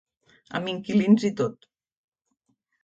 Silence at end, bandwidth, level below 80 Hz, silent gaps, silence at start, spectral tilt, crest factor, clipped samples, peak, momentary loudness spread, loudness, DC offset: 1.3 s; 7.6 kHz; -70 dBFS; none; 0.5 s; -6.5 dB/octave; 20 dB; under 0.1%; -6 dBFS; 11 LU; -24 LUFS; under 0.1%